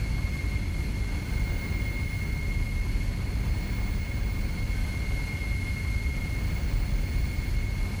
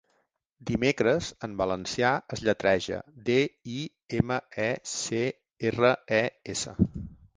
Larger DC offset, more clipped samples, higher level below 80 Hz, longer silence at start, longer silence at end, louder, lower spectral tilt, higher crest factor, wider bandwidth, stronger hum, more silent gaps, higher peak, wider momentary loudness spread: neither; neither; first, -30 dBFS vs -50 dBFS; second, 0 s vs 0.6 s; second, 0 s vs 0.25 s; second, -31 LUFS vs -28 LUFS; about the same, -6 dB/octave vs -5 dB/octave; second, 12 dB vs 22 dB; first, over 20 kHz vs 10 kHz; neither; neither; second, -16 dBFS vs -6 dBFS; second, 1 LU vs 10 LU